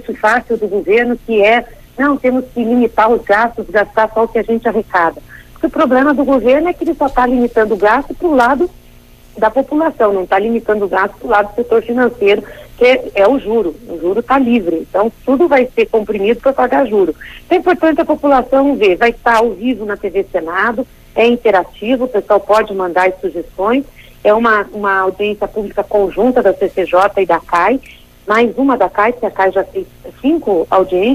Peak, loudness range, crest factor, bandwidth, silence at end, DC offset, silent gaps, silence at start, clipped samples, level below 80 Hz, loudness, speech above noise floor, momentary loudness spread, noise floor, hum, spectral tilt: 0 dBFS; 2 LU; 12 dB; 15.5 kHz; 0 s; under 0.1%; none; 0 s; under 0.1%; -40 dBFS; -13 LUFS; 28 dB; 7 LU; -41 dBFS; none; -6 dB/octave